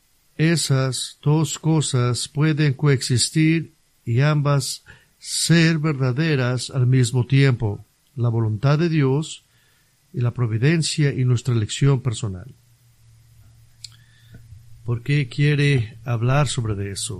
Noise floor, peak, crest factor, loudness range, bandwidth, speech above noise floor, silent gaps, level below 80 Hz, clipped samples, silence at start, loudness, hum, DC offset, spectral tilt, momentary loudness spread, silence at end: -60 dBFS; -4 dBFS; 18 dB; 6 LU; 13 kHz; 40 dB; none; -48 dBFS; under 0.1%; 0.4 s; -20 LUFS; none; under 0.1%; -5.5 dB/octave; 15 LU; 0 s